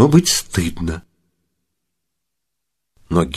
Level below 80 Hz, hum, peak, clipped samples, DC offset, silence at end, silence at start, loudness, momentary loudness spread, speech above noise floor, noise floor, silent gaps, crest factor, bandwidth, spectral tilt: -38 dBFS; none; 0 dBFS; under 0.1%; under 0.1%; 0 s; 0 s; -18 LUFS; 13 LU; 63 dB; -80 dBFS; none; 20 dB; 14 kHz; -5 dB/octave